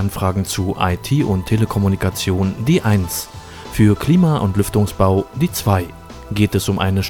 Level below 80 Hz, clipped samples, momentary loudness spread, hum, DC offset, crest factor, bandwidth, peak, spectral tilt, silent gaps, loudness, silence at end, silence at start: -36 dBFS; under 0.1%; 9 LU; none; under 0.1%; 16 dB; 18.5 kHz; -2 dBFS; -6 dB/octave; none; -17 LUFS; 0 s; 0 s